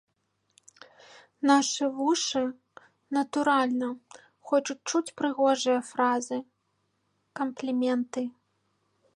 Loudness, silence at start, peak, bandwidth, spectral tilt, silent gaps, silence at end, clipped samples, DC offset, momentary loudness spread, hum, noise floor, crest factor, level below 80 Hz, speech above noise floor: -28 LUFS; 1.4 s; -10 dBFS; 11.5 kHz; -2.5 dB/octave; none; 0.85 s; under 0.1%; under 0.1%; 11 LU; none; -76 dBFS; 18 dB; -80 dBFS; 49 dB